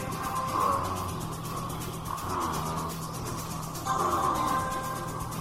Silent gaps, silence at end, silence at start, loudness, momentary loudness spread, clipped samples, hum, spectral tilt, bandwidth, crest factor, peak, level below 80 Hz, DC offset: none; 0 s; 0 s; -31 LUFS; 8 LU; under 0.1%; none; -4.5 dB/octave; 16 kHz; 16 dB; -16 dBFS; -48 dBFS; under 0.1%